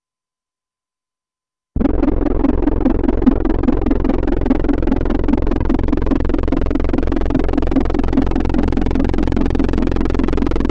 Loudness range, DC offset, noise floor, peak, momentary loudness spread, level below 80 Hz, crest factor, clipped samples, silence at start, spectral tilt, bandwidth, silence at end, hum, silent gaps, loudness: 1 LU; under 0.1%; under -90 dBFS; 0 dBFS; 2 LU; -18 dBFS; 16 dB; under 0.1%; 1.75 s; -9 dB/octave; 6 kHz; 0 s; none; none; -18 LUFS